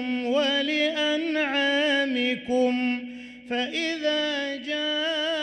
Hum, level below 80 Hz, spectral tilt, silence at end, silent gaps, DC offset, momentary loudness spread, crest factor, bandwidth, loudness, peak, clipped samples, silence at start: none; -68 dBFS; -2.5 dB/octave; 0 s; none; under 0.1%; 7 LU; 12 dB; 9.4 kHz; -25 LUFS; -12 dBFS; under 0.1%; 0 s